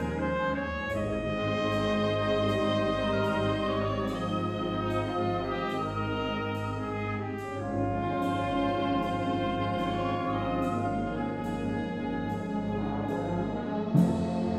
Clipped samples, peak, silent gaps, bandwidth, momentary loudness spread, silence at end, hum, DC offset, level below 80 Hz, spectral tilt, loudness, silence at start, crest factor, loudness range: under 0.1%; -12 dBFS; none; 14 kHz; 5 LU; 0 s; none; under 0.1%; -48 dBFS; -7 dB/octave; -30 LUFS; 0 s; 18 dB; 3 LU